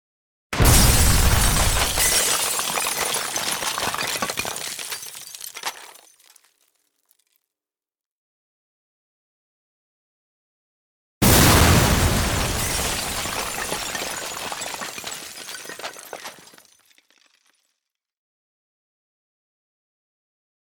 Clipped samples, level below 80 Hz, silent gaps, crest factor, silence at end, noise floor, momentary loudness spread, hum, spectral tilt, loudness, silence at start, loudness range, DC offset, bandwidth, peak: under 0.1%; -30 dBFS; 8.06-11.21 s; 22 dB; 4.35 s; under -90 dBFS; 19 LU; none; -3 dB/octave; -20 LUFS; 0.5 s; 19 LU; under 0.1%; 19.5 kHz; -2 dBFS